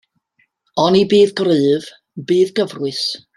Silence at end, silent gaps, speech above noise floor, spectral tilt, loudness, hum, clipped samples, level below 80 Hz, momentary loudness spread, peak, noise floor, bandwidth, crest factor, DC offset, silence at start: 0.2 s; none; 48 dB; -5.5 dB/octave; -16 LUFS; none; under 0.1%; -60 dBFS; 11 LU; -2 dBFS; -63 dBFS; 12 kHz; 16 dB; under 0.1%; 0.75 s